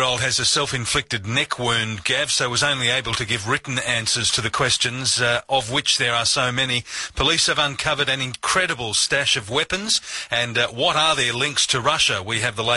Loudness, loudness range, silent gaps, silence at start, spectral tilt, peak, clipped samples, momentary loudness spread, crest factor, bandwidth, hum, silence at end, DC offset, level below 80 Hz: -19 LUFS; 1 LU; none; 0 s; -2 dB/octave; -4 dBFS; under 0.1%; 5 LU; 16 dB; 11.5 kHz; none; 0 s; under 0.1%; -46 dBFS